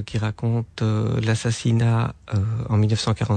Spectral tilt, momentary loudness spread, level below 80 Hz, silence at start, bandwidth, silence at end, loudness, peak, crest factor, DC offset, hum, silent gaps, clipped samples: -6.5 dB/octave; 5 LU; -46 dBFS; 0 s; 9.4 kHz; 0 s; -22 LUFS; -10 dBFS; 10 dB; under 0.1%; none; none; under 0.1%